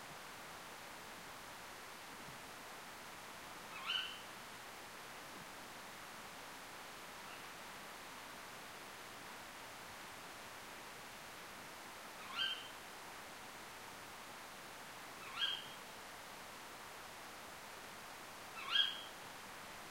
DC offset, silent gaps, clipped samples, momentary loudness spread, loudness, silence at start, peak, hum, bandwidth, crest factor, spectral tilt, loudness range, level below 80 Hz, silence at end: under 0.1%; none; under 0.1%; 11 LU; -47 LUFS; 0 s; -22 dBFS; none; 16 kHz; 28 dB; -1 dB/octave; 8 LU; -76 dBFS; 0 s